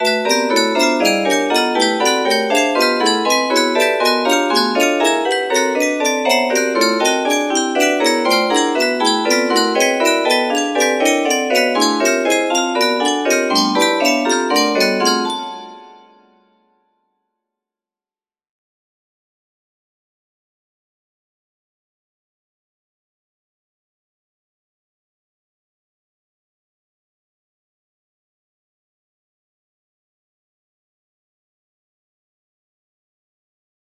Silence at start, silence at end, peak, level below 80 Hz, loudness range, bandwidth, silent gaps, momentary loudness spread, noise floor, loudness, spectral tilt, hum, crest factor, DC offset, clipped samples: 0 s; 18.1 s; 0 dBFS; -70 dBFS; 3 LU; 15.5 kHz; none; 2 LU; under -90 dBFS; -15 LUFS; -1.5 dB/octave; none; 18 dB; under 0.1%; under 0.1%